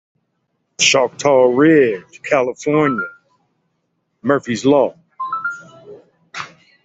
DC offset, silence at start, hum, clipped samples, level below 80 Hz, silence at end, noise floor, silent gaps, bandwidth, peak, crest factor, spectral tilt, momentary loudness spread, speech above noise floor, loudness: under 0.1%; 0.8 s; none; under 0.1%; -62 dBFS; 0.4 s; -69 dBFS; none; 8.2 kHz; 0 dBFS; 16 dB; -4 dB/octave; 19 LU; 55 dB; -16 LUFS